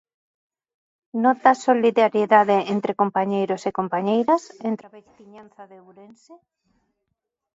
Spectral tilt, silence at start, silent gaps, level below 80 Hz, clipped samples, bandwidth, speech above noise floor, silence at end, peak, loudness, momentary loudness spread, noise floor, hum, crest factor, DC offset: -6 dB/octave; 1.15 s; none; -72 dBFS; under 0.1%; 8 kHz; 58 dB; 1.2 s; -2 dBFS; -20 LUFS; 12 LU; -79 dBFS; none; 20 dB; under 0.1%